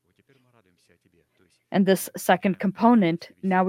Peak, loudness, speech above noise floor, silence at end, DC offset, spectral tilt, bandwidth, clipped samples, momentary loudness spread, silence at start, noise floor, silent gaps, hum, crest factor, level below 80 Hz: -4 dBFS; -22 LUFS; 40 dB; 0 s; under 0.1%; -6 dB/octave; 16 kHz; under 0.1%; 7 LU; 1.7 s; -63 dBFS; none; none; 20 dB; -70 dBFS